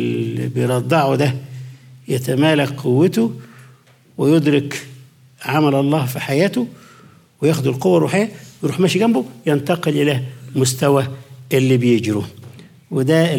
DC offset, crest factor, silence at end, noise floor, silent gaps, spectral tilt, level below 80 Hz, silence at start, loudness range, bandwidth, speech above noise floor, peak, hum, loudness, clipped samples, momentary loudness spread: under 0.1%; 14 dB; 0 s; -49 dBFS; none; -6 dB/octave; -64 dBFS; 0 s; 2 LU; 17.5 kHz; 32 dB; -4 dBFS; none; -18 LUFS; under 0.1%; 12 LU